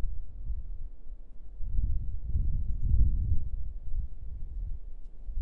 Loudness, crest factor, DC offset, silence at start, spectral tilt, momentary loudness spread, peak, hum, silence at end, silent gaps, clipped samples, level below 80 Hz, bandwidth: -36 LUFS; 16 dB; under 0.1%; 0 s; -12 dB/octave; 19 LU; -12 dBFS; none; 0 s; none; under 0.1%; -32 dBFS; 0.8 kHz